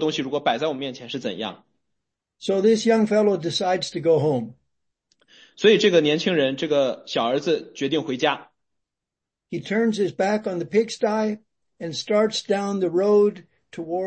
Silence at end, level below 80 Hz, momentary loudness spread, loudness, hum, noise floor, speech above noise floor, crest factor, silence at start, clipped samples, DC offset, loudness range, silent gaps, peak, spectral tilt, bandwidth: 0 s; -70 dBFS; 13 LU; -22 LUFS; none; -86 dBFS; 64 dB; 18 dB; 0 s; under 0.1%; under 0.1%; 4 LU; none; -4 dBFS; -5 dB/octave; 8.8 kHz